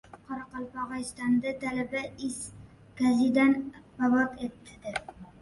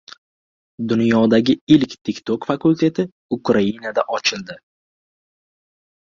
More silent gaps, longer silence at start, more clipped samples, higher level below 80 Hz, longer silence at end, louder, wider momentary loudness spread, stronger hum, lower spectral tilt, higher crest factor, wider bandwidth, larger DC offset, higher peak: second, none vs 1.61-1.67 s, 2.01-2.05 s, 3.12-3.29 s; second, 0.15 s vs 0.8 s; neither; about the same, -60 dBFS vs -58 dBFS; second, 0.1 s vs 1.55 s; second, -29 LUFS vs -18 LUFS; first, 16 LU vs 11 LU; neither; about the same, -5 dB/octave vs -6 dB/octave; about the same, 16 dB vs 18 dB; first, 11.5 kHz vs 7.4 kHz; neither; second, -12 dBFS vs -2 dBFS